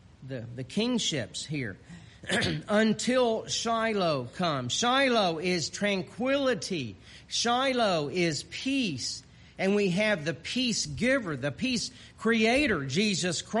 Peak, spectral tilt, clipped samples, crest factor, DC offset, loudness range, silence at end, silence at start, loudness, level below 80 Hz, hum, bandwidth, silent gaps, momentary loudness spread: -12 dBFS; -4 dB/octave; under 0.1%; 16 dB; under 0.1%; 2 LU; 0 s; 0.2 s; -28 LUFS; -58 dBFS; none; 11.5 kHz; none; 10 LU